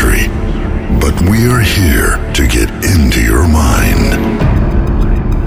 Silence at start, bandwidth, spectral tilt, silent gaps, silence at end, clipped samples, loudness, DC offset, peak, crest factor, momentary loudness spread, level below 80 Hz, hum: 0 s; 16 kHz; -5.5 dB/octave; none; 0 s; under 0.1%; -11 LUFS; under 0.1%; 0 dBFS; 10 dB; 5 LU; -12 dBFS; none